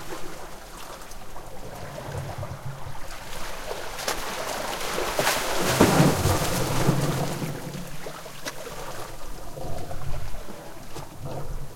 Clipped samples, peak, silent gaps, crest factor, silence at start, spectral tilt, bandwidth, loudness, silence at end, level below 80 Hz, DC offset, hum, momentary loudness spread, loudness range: under 0.1%; -2 dBFS; none; 26 dB; 0 s; -4.5 dB/octave; 16.5 kHz; -27 LUFS; 0 s; -40 dBFS; under 0.1%; none; 18 LU; 14 LU